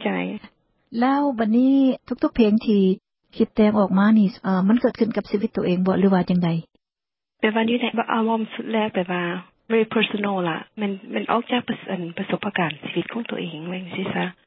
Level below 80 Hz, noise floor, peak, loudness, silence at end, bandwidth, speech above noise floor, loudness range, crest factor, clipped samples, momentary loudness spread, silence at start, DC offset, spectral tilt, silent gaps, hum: -56 dBFS; -90 dBFS; -4 dBFS; -22 LUFS; 0.15 s; 5.8 kHz; 69 dB; 6 LU; 18 dB; under 0.1%; 11 LU; 0 s; under 0.1%; -11.5 dB/octave; none; none